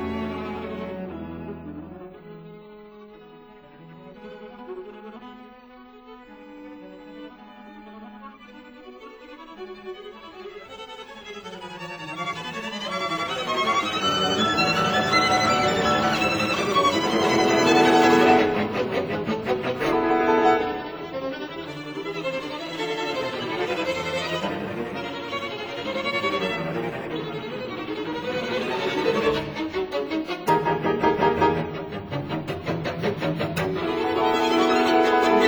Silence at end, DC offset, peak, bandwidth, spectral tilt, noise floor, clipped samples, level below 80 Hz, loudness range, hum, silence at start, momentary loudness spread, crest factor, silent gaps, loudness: 0 s; under 0.1%; -2 dBFS; over 20 kHz; -4.5 dB/octave; -47 dBFS; under 0.1%; -54 dBFS; 23 LU; none; 0 s; 23 LU; 22 dB; none; -23 LUFS